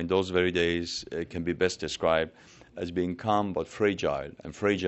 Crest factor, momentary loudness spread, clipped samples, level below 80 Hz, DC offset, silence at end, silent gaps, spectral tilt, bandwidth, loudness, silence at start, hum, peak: 18 dB; 9 LU; under 0.1%; -54 dBFS; under 0.1%; 0 s; none; -5 dB/octave; 8.2 kHz; -29 LUFS; 0 s; none; -10 dBFS